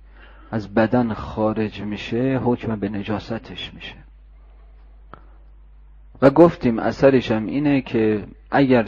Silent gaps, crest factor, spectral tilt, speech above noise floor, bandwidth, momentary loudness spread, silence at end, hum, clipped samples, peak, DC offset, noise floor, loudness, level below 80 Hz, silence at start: none; 20 dB; -8 dB/octave; 26 dB; 7.2 kHz; 15 LU; 0 s; none; under 0.1%; -2 dBFS; under 0.1%; -45 dBFS; -20 LUFS; -44 dBFS; 0.2 s